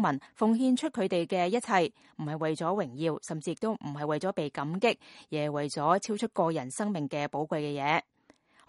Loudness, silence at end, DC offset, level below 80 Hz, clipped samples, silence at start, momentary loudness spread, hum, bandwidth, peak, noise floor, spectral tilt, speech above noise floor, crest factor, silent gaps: -31 LUFS; 0.65 s; under 0.1%; -76 dBFS; under 0.1%; 0 s; 7 LU; none; 11.5 kHz; -10 dBFS; -63 dBFS; -5.5 dB/octave; 33 dB; 20 dB; none